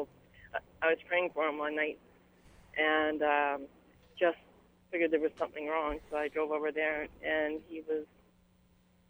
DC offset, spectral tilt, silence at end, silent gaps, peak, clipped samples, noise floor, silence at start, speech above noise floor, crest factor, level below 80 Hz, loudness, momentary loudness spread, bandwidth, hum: under 0.1%; -5.5 dB/octave; 1.05 s; none; -16 dBFS; under 0.1%; -67 dBFS; 0 s; 34 dB; 20 dB; -62 dBFS; -33 LUFS; 13 LU; over 20 kHz; none